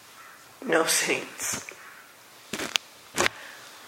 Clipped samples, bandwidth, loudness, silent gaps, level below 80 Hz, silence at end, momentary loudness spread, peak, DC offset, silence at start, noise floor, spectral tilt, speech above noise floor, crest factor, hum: under 0.1%; 16.5 kHz; -27 LUFS; none; -66 dBFS; 0 s; 24 LU; -2 dBFS; under 0.1%; 0.05 s; -50 dBFS; -1 dB/octave; 24 dB; 30 dB; none